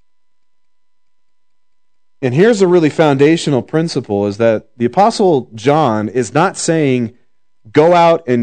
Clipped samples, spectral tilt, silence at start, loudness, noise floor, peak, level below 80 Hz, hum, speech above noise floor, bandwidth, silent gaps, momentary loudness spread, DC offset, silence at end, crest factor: 0.2%; -6 dB/octave; 2.2 s; -13 LUFS; -75 dBFS; 0 dBFS; -62 dBFS; none; 63 dB; 9.4 kHz; none; 7 LU; 0.4%; 0 s; 14 dB